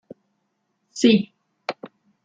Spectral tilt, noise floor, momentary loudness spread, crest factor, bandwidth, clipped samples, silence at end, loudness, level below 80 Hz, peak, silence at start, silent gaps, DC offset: -5 dB/octave; -73 dBFS; 21 LU; 22 dB; 9.2 kHz; under 0.1%; 0.4 s; -20 LUFS; -70 dBFS; -4 dBFS; 0.95 s; none; under 0.1%